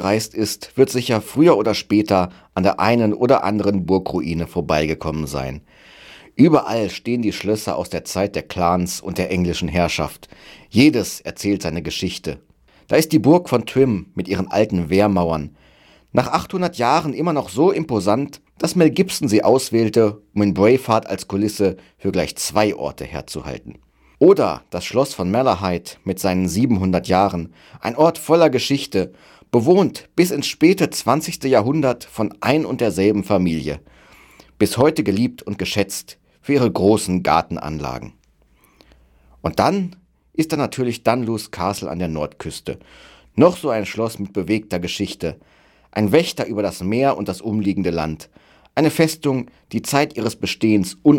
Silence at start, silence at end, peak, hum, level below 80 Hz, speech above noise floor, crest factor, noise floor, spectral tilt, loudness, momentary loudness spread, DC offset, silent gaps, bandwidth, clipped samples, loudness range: 0 s; 0 s; -2 dBFS; none; -46 dBFS; 38 dB; 18 dB; -56 dBFS; -5.5 dB/octave; -19 LUFS; 12 LU; under 0.1%; none; 17.5 kHz; under 0.1%; 4 LU